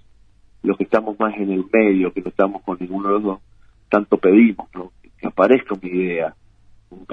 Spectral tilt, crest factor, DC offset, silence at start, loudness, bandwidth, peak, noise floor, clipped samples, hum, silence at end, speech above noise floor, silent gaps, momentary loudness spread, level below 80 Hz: -9 dB/octave; 18 dB; under 0.1%; 0.65 s; -19 LUFS; 5 kHz; 0 dBFS; -50 dBFS; under 0.1%; none; 0.1 s; 33 dB; none; 15 LU; -54 dBFS